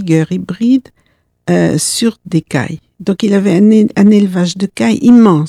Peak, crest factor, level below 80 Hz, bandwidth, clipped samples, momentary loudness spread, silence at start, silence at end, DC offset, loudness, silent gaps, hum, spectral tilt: 0 dBFS; 10 dB; -50 dBFS; 14.5 kHz; 0.3%; 10 LU; 0 s; 0 s; under 0.1%; -11 LUFS; none; none; -6 dB/octave